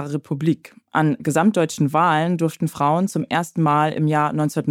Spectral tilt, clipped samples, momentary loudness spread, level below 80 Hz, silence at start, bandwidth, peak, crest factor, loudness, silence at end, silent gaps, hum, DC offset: -6.5 dB/octave; under 0.1%; 5 LU; -66 dBFS; 0 s; 16 kHz; -4 dBFS; 14 dB; -20 LUFS; 0 s; none; none; under 0.1%